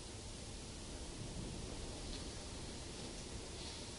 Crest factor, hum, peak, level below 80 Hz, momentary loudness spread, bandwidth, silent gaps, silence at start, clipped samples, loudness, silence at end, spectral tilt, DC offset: 14 dB; none; -34 dBFS; -52 dBFS; 2 LU; 11.5 kHz; none; 0 s; under 0.1%; -48 LUFS; 0 s; -3.5 dB/octave; under 0.1%